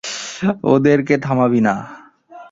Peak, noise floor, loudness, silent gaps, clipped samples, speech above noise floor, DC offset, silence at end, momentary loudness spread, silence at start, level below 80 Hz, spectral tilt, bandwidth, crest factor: -2 dBFS; -41 dBFS; -16 LUFS; none; under 0.1%; 26 dB; under 0.1%; 0.05 s; 12 LU; 0.05 s; -54 dBFS; -6 dB/octave; 7.8 kHz; 16 dB